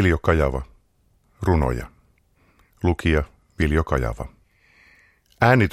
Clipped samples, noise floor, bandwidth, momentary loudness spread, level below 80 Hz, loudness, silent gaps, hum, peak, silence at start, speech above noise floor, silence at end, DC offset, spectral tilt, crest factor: under 0.1%; -62 dBFS; 13.5 kHz; 17 LU; -32 dBFS; -22 LUFS; none; none; -2 dBFS; 0 s; 43 dB; 0 s; under 0.1%; -7.5 dB/octave; 22 dB